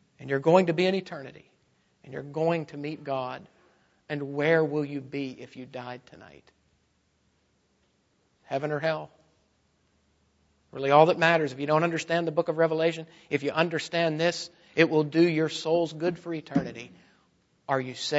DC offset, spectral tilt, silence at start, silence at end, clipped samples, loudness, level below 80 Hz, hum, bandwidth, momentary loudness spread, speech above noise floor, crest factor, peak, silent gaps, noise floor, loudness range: under 0.1%; -6 dB/octave; 0.2 s; 0 s; under 0.1%; -26 LUFS; -70 dBFS; none; 8 kHz; 19 LU; 44 dB; 24 dB; -6 dBFS; none; -70 dBFS; 11 LU